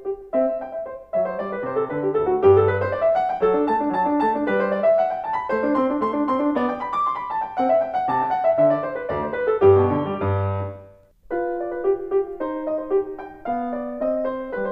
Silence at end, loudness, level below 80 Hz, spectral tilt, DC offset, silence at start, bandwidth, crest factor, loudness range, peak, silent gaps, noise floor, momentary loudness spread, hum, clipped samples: 0 s; -22 LUFS; -54 dBFS; -9.5 dB/octave; under 0.1%; 0 s; 5.2 kHz; 18 dB; 5 LU; -4 dBFS; none; -48 dBFS; 9 LU; none; under 0.1%